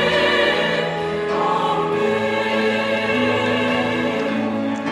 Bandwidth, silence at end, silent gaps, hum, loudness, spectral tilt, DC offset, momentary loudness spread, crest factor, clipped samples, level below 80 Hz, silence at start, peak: 13.5 kHz; 0 s; none; none; -19 LUFS; -5 dB/octave; under 0.1%; 6 LU; 14 dB; under 0.1%; -54 dBFS; 0 s; -6 dBFS